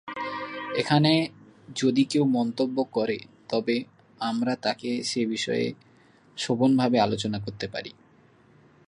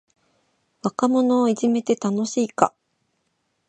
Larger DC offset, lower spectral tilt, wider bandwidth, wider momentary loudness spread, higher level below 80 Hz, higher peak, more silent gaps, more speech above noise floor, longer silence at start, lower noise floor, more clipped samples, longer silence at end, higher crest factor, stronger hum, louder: neither; about the same, -5.5 dB/octave vs -5.5 dB/octave; first, 11.5 kHz vs 9 kHz; first, 12 LU vs 6 LU; first, -64 dBFS vs -70 dBFS; second, -6 dBFS vs 0 dBFS; neither; second, 33 dB vs 52 dB; second, 0.05 s vs 0.85 s; second, -58 dBFS vs -72 dBFS; neither; about the same, 1 s vs 1 s; about the same, 22 dB vs 22 dB; neither; second, -26 LUFS vs -22 LUFS